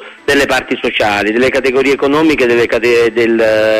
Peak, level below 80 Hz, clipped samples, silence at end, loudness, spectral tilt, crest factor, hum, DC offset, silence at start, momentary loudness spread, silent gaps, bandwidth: 0 dBFS; -40 dBFS; under 0.1%; 0 s; -11 LUFS; -4.5 dB/octave; 10 dB; none; under 0.1%; 0 s; 3 LU; none; 15.5 kHz